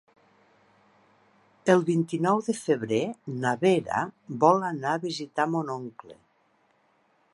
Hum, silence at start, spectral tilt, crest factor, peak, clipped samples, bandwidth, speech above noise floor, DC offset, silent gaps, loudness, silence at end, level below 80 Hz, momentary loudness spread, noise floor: none; 1.65 s; -6 dB/octave; 22 dB; -6 dBFS; under 0.1%; 11.5 kHz; 41 dB; under 0.1%; none; -26 LUFS; 1.2 s; -72 dBFS; 10 LU; -67 dBFS